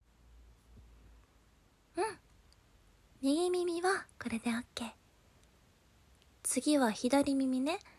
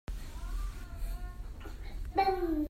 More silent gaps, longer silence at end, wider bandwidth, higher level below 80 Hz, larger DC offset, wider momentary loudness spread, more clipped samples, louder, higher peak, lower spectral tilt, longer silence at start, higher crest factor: neither; about the same, 0.1 s vs 0 s; about the same, 15 kHz vs 16 kHz; second, -64 dBFS vs -40 dBFS; neither; second, 13 LU vs 16 LU; neither; first, -34 LUFS vs -37 LUFS; about the same, -18 dBFS vs -18 dBFS; second, -3 dB/octave vs -6.5 dB/octave; first, 0.75 s vs 0.1 s; about the same, 20 dB vs 18 dB